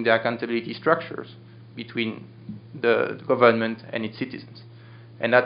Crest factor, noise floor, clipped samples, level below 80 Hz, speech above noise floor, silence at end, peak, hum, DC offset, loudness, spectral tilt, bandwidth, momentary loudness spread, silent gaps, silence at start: 24 dB; -45 dBFS; under 0.1%; -72 dBFS; 21 dB; 0 s; -2 dBFS; none; under 0.1%; -24 LUFS; -3.5 dB/octave; 5.4 kHz; 22 LU; none; 0 s